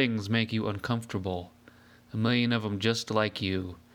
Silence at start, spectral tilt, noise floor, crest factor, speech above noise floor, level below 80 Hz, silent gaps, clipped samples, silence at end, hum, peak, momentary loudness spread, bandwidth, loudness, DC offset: 0 s; -5.5 dB/octave; -56 dBFS; 18 dB; 27 dB; -62 dBFS; none; under 0.1%; 0.15 s; none; -10 dBFS; 9 LU; 15.5 kHz; -29 LUFS; under 0.1%